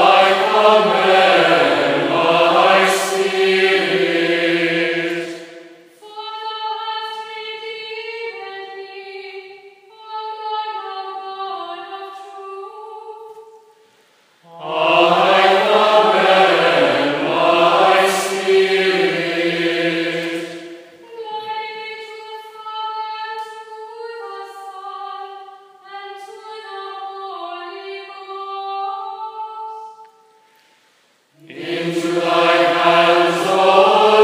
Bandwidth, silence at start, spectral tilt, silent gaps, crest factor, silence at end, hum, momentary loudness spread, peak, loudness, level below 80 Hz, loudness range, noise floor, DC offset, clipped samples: 15.5 kHz; 0 s; -3.5 dB/octave; none; 18 dB; 0 s; none; 21 LU; 0 dBFS; -15 LUFS; -84 dBFS; 18 LU; -58 dBFS; under 0.1%; under 0.1%